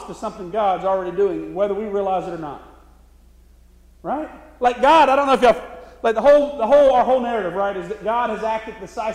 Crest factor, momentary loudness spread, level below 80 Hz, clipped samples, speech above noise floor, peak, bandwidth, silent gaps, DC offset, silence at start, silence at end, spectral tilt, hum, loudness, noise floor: 16 dB; 17 LU; -48 dBFS; under 0.1%; 31 dB; -4 dBFS; 10.5 kHz; none; under 0.1%; 0 s; 0 s; -5 dB/octave; none; -18 LUFS; -49 dBFS